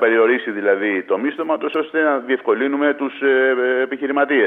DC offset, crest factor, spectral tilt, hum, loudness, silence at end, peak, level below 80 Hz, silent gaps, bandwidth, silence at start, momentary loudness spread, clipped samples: under 0.1%; 14 dB; -7 dB/octave; none; -18 LUFS; 0 s; -4 dBFS; -78 dBFS; none; 3.9 kHz; 0 s; 5 LU; under 0.1%